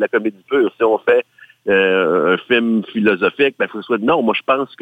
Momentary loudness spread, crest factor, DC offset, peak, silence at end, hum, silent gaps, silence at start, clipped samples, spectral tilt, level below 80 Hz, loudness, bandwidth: 5 LU; 14 dB; under 0.1%; -2 dBFS; 0.15 s; none; none; 0 s; under 0.1%; -7 dB/octave; -62 dBFS; -16 LUFS; 4.8 kHz